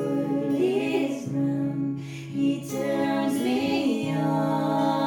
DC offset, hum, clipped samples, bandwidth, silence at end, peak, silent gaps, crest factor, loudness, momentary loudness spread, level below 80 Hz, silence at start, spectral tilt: under 0.1%; none; under 0.1%; 17.5 kHz; 0 s; -12 dBFS; none; 12 dB; -26 LUFS; 4 LU; -66 dBFS; 0 s; -6.5 dB/octave